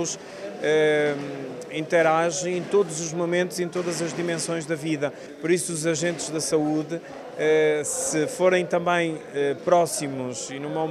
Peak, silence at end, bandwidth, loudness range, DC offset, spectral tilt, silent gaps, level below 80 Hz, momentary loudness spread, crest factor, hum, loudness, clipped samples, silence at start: -6 dBFS; 0 s; 14 kHz; 3 LU; under 0.1%; -4 dB/octave; none; -68 dBFS; 11 LU; 18 dB; none; -24 LUFS; under 0.1%; 0 s